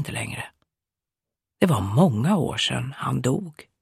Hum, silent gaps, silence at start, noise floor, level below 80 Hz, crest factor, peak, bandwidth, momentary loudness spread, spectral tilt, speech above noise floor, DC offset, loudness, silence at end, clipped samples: none; none; 0 s; -89 dBFS; -54 dBFS; 20 dB; -4 dBFS; 15 kHz; 14 LU; -5.5 dB/octave; 66 dB; under 0.1%; -23 LUFS; 0.2 s; under 0.1%